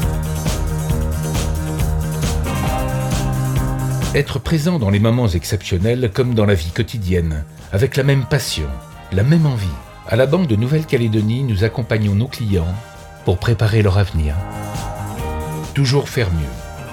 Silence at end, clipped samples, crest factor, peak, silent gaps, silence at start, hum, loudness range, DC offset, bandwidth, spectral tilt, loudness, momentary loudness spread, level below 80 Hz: 0 s; under 0.1%; 16 dB; -2 dBFS; none; 0 s; none; 3 LU; under 0.1%; 18.5 kHz; -6.5 dB/octave; -18 LUFS; 10 LU; -30 dBFS